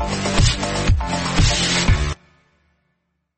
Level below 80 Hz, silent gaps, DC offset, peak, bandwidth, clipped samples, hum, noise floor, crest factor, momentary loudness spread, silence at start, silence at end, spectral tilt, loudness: -24 dBFS; none; under 0.1%; -4 dBFS; 8.8 kHz; under 0.1%; none; -71 dBFS; 16 dB; 5 LU; 0 s; 1.25 s; -4 dB/octave; -19 LUFS